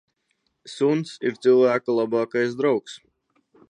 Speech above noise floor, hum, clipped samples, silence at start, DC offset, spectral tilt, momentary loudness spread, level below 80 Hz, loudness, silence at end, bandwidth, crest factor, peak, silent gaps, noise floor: 51 dB; none; under 0.1%; 0.65 s; under 0.1%; -6 dB/octave; 16 LU; -76 dBFS; -22 LUFS; 0.75 s; 9.8 kHz; 16 dB; -8 dBFS; none; -73 dBFS